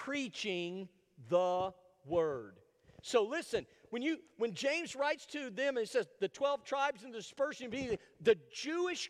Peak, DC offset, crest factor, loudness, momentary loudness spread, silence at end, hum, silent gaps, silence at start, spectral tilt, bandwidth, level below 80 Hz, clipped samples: -16 dBFS; under 0.1%; 22 dB; -36 LUFS; 10 LU; 0 s; none; none; 0 s; -4 dB/octave; 13 kHz; -72 dBFS; under 0.1%